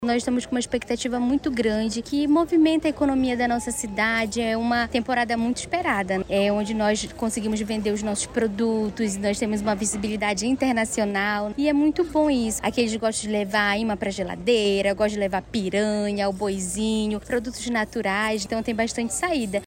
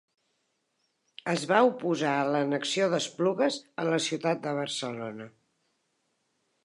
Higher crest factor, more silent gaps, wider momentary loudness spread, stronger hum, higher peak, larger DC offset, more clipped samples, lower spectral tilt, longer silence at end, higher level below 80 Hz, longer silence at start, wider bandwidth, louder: second, 14 dB vs 22 dB; neither; second, 5 LU vs 13 LU; neither; about the same, -8 dBFS vs -8 dBFS; neither; neither; about the same, -4 dB/octave vs -4.5 dB/octave; second, 0 s vs 1.35 s; first, -46 dBFS vs -82 dBFS; second, 0 s vs 1.25 s; first, 16 kHz vs 11.5 kHz; first, -24 LUFS vs -28 LUFS